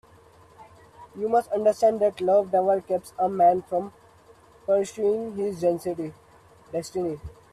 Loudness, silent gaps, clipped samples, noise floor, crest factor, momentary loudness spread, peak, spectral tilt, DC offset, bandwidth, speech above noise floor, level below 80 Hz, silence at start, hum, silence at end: -25 LUFS; none; under 0.1%; -54 dBFS; 16 dB; 13 LU; -10 dBFS; -6.5 dB/octave; under 0.1%; 13.5 kHz; 30 dB; -60 dBFS; 0.6 s; none; 0.25 s